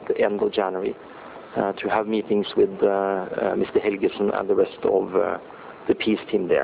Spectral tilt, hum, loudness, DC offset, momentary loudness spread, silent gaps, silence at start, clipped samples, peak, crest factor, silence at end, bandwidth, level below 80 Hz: -10 dB/octave; none; -23 LUFS; under 0.1%; 10 LU; none; 0 s; under 0.1%; -6 dBFS; 16 dB; 0 s; 4 kHz; -58 dBFS